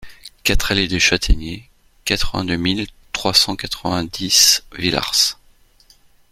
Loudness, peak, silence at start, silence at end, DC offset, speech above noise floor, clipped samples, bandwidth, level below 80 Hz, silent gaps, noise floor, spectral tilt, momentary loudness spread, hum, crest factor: -17 LUFS; 0 dBFS; 0 s; 1 s; under 0.1%; 35 dB; under 0.1%; 16.5 kHz; -28 dBFS; none; -53 dBFS; -2 dB/octave; 12 LU; none; 20 dB